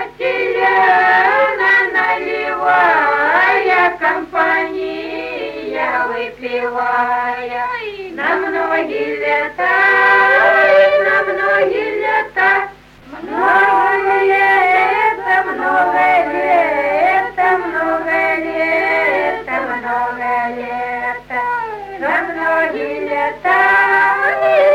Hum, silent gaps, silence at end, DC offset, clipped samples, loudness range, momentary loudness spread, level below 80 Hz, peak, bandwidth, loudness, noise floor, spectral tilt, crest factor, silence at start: none; none; 0 s; under 0.1%; under 0.1%; 7 LU; 10 LU; -50 dBFS; 0 dBFS; 14 kHz; -14 LUFS; -36 dBFS; -4.5 dB/octave; 14 dB; 0 s